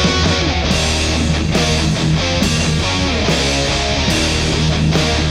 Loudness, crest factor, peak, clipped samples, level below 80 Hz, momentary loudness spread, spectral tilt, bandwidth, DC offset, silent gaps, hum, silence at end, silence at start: -15 LUFS; 12 dB; -2 dBFS; under 0.1%; -24 dBFS; 1 LU; -4 dB/octave; 14.5 kHz; under 0.1%; none; none; 0 s; 0 s